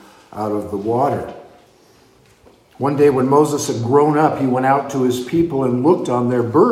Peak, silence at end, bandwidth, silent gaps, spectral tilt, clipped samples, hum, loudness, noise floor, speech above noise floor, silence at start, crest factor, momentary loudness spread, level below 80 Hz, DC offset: -2 dBFS; 0 s; 15.5 kHz; none; -6.5 dB/octave; under 0.1%; none; -17 LUFS; -51 dBFS; 35 dB; 0.3 s; 16 dB; 9 LU; -54 dBFS; under 0.1%